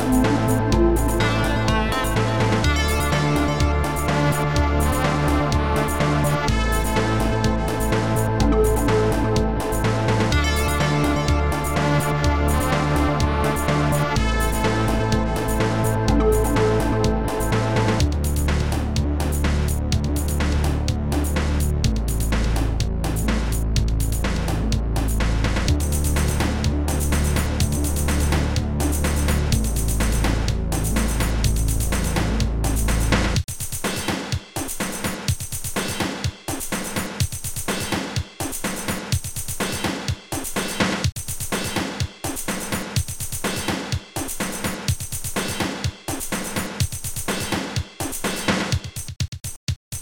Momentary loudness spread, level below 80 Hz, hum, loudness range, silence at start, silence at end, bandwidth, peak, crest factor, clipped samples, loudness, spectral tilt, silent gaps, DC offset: 7 LU; -26 dBFS; none; 5 LU; 0 s; 0 s; 19.5 kHz; -6 dBFS; 16 dB; under 0.1%; -22 LUFS; -5 dB/octave; 49.28-49.32 s, 49.56-49.67 s, 49.76-49.91 s; under 0.1%